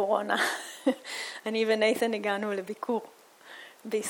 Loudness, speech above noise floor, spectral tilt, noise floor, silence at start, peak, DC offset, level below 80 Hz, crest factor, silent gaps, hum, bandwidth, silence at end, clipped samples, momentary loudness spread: -29 LUFS; 21 dB; -3 dB/octave; -50 dBFS; 0 s; -10 dBFS; under 0.1%; -82 dBFS; 20 dB; none; none; 19.5 kHz; 0 s; under 0.1%; 16 LU